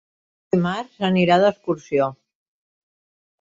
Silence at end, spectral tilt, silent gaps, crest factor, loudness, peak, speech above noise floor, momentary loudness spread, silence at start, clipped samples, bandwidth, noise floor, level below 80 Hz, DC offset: 1.25 s; -7 dB/octave; none; 18 dB; -20 LUFS; -4 dBFS; over 70 dB; 9 LU; 0.55 s; under 0.1%; 7.8 kHz; under -90 dBFS; -60 dBFS; under 0.1%